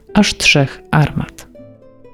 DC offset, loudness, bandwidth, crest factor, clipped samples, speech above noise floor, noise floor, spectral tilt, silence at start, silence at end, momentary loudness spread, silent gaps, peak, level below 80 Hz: under 0.1%; -14 LUFS; 14.5 kHz; 16 dB; under 0.1%; 27 dB; -41 dBFS; -4.5 dB/octave; 0.1 s; 0.5 s; 13 LU; none; 0 dBFS; -36 dBFS